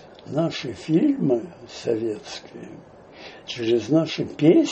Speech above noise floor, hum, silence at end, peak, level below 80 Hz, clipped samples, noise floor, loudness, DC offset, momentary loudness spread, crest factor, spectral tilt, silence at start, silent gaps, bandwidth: 21 dB; none; 0 s; -4 dBFS; -62 dBFS; under 0.1%; -43 dBFS; -23 LUFS; under 0.1%; 20 LU; 18 dB; -6.5 dB/octave; 0.05 s; none; 8.4 kHz